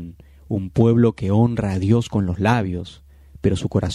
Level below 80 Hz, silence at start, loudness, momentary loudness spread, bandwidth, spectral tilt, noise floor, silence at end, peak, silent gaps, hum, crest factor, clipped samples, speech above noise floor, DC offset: -42 dBFS; 0 s; -20 LUFS; 11 LU; 11 kHz; -8 dB/octave; -38 dBFS; 0 s; -2 dBFS; none; none; 18 dB; under 0.1%; 20 dB; under 0.1%